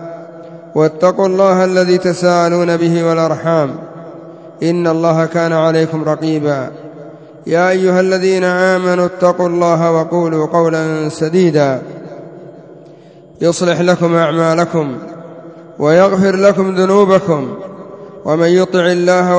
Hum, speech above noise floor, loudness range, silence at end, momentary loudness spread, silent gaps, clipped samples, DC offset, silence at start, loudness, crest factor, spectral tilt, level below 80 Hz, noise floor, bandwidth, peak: none; 27 dB; 3 LU; 0 s; 20 LU; none; under 0.1%; under 0.1%; 0 s; -13 LUFS; 14 dB; -6.5 dB/octave; -58 dBFS; -39 dBFS; 8 kHz; 0 dBFS